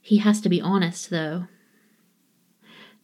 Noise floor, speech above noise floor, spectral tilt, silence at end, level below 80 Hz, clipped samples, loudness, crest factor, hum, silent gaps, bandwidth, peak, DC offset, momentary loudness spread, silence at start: -65 dBFS; 43 dB; -6 dB/octave; 0.2 s; -80 dBFS; under 0.1%; -23 LUFS; 18 dB; none; none; 12.5 kHz; -8 dBFS; under 0.1%; 13 LU; 0.05 s